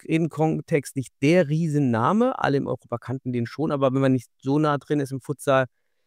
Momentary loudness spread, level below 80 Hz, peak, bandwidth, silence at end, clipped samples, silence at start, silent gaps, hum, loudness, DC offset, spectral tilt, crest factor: 9 LU; -64 dBFS; -6 dBFS; 15.5 kHz; 0.4 s; under 0.1%; 0.1 s; none; none; -24 LUFS; under 0.1%; -7 dB/octave; 16 dB